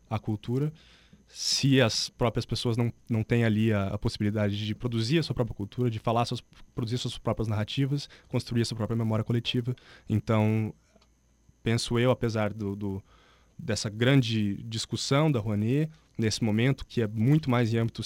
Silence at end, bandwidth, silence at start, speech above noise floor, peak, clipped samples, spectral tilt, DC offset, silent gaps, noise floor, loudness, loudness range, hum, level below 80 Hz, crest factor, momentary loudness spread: 0 s; 15.5 kHz; 0.1 s; 36 dB; -10 dBFS; under 0.1%; -6 dB/octave; under 0.1%; none; -64 dBFS; -28 LUFS; 4 LU; none; -52 dBFS; 18 dB; 9 LU